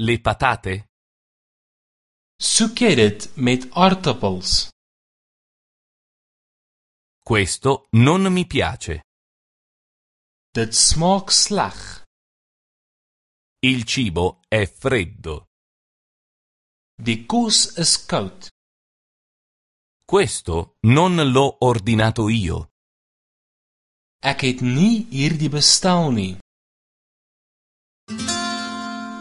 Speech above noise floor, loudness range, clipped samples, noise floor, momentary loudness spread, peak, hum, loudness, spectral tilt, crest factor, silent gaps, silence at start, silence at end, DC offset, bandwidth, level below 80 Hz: over 72 dB; 5 LU; under 0.1%; under -90 dBFS; 14 LU; 0 dBFS; none; -18 LUFS; -4 dB/octave; 20 dB; 0.89-2.39 s, 4.72-7.22 s, 9.04-10.53 s, 12.06-13.56 s, 15.47-16.98 s, 18.51-20.00 s, 22.71-24.19 s, 26.41-28.07 s; 0 s; 0 s; under 0.1%; 11.5 kHz; -40 dBFS